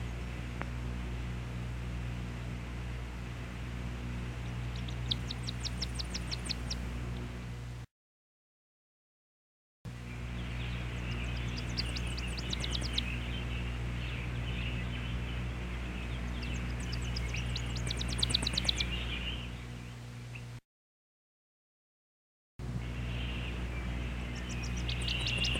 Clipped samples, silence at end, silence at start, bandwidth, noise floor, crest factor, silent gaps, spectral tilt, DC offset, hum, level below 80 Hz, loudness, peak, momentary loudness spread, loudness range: under 0.1%; 0 s; 0 s; 15 kHz; under -90 dBFS; 22 dB; 7.91-9.85 s, 20.65-22.59 s; -4 dB/octave; under 0.1%; 60 Hz at -40 dBFS; -42 dBFS; -37 LUFS; -16 dBFS; 9 LU; 10 LU